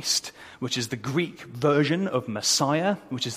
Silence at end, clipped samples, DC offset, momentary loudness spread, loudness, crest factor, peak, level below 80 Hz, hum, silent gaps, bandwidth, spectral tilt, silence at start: 0 s; under 0.1%; under 0.1%; 8 LU; -25 LUFS; 18 dB; -8 dBFS; -66 dBFS; none; none; 15.5 kHz; -3.5 dB/octave; 0 s